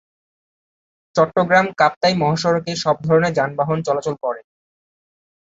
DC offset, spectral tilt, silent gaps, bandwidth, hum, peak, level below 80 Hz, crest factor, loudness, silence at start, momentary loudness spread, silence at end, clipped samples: under 0.1%; -5.5 dB/octave; 1.96-2.01 s; 8 kHz; none; -2 dBFS; -58 dBFS; 18 dB; -18 LUFS; 1.15 s; 9 LU; 1 s; under 0.1%